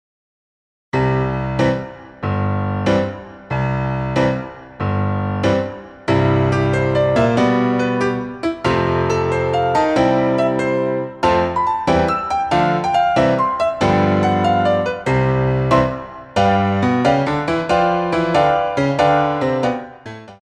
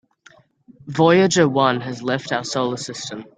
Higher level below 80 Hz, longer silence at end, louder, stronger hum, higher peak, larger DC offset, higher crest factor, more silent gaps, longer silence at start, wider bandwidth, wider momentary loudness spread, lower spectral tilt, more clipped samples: first, -40 dBFS vs -60 dBFS; about the same, 0.05 s vs 0.15 s; about the same, -17 LUFS vs -19 LUFS; neither; about the same, -2 dBFS vs -2 dBFS; neither; about the same, 16 dB vs 18 dB; neither; about the same, 0.95 s vs 0.85 s; about the same, 10 kHz vs 9.6 kHz; second, 8 LU vs 14 LU; first, -7 dB/octave vs -5 dB/octave; neither